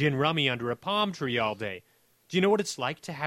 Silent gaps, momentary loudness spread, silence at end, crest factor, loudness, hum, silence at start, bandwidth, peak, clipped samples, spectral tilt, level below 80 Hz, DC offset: none; 9 LU; 0 s; 20 dB; -28 LUFS; none; 0 s; 16 kHz; -10 dBFS; under 0.1%; -5 dB/octave; -66 dBFS; under 0.1%